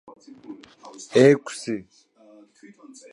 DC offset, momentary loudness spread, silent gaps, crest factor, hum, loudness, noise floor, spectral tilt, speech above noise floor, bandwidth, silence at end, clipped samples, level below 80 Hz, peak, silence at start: under 0.1%; 26 LU; none; 22 dB; none; -21 LUFS; -52 dBFS; -5.5 dB/octave; 29 dB; 11.5 kHz; 1.35 s; under 0.1%; -72 dBFS; -2 dBFS; 0.5 s